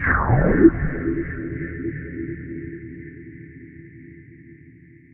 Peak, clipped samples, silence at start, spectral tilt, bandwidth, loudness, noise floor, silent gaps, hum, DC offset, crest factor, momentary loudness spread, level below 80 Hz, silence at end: 0 dBFS; under 0.1%; 0 s; -10.5 dB/octave; 2.9 kHz; -22 LUFS; -48 dBFS; none; none; under 0.1%; 22 dB; 27 LU; -34 dBFS; 0.45 s